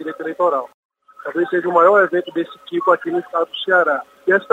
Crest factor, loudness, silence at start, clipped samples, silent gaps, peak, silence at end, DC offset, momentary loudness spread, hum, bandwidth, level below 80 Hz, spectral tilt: 16 dB; -18 LUFS; 0 s; under 0.1%; 0.74-0.89 s; -2 dBFS; 0.1 s; under 0.1%; 13 LU; none; 8 kHz; -76 dBFS; -6 dB/octave